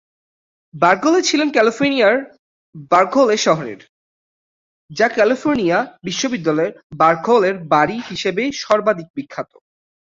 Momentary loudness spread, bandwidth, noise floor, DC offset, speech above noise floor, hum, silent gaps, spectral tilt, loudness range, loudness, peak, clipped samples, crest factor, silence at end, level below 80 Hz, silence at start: 10 LU; 7.8 kHz; under -90 dBFS; under 0.1%; over 73 dB; none; 2.39-2.73 s, 3.89-4.89 s, 6.83-6.90 s, 9.10-9.14 s; -4 dB/octave; 3 LU; -16 LUFS; -2 dBFS; under 0.1%; 16 dB; 0.65 s; -60 dBFS; 0.75 s